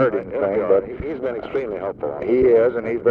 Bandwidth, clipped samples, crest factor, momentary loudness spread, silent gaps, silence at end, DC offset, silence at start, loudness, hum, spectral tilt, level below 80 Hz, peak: 4.9 kHz; under 0.1%; 14 dB; 11 LU; none; 0 s; under 0.1%; 0 s; -20 LUFS; none; -9.5 dB/octave; -46 dBFS; -6 dBFS